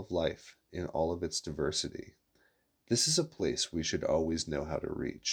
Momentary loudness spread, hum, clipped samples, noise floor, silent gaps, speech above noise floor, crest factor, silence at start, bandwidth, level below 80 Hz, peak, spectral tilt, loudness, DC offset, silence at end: 11 LU; none; under 0.1%; -72 dBFS; none; 38 dB; 20 dB; 0 s; 19.5 kHz; -54 dBFS; -14 dBFS; -3.5 dB/octave; -33 LUFS; under 0.1%; 0 s